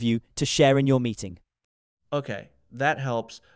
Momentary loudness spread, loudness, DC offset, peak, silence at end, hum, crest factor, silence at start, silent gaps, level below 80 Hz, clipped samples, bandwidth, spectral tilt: 17 LU; -24 LUFS; under 0.1%; -6 dBFS; 0.2 s; none; 20 dB; 0 s; 1.64-1.97 s; -56 dBFS; under 0.1%; 8 kHz; -5.5 dB/octave